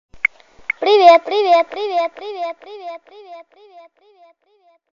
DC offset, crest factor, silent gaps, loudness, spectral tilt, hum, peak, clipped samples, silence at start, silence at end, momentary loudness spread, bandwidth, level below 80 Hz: under 0.1%; 18 dB; none; -15 LUFS; -2.5 dB/octave; none; 0 dBFS; under 0.1%; 0.15 s; 1.6 s; 23 LU; 7.2 kHz; -64 dBFS